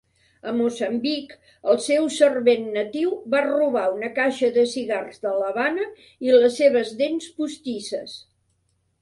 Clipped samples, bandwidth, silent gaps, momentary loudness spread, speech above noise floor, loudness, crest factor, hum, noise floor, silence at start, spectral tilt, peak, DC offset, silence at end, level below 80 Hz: under 0.1%; 11.5 kHz; none; 12 LU; 47 dB; -22 LUFS; 18 dB; none; -69 dBFS; 0.45 s; -3.5 dB/octave; -4 dBFS; under 0.1%; 0.8 s; -68 dBFS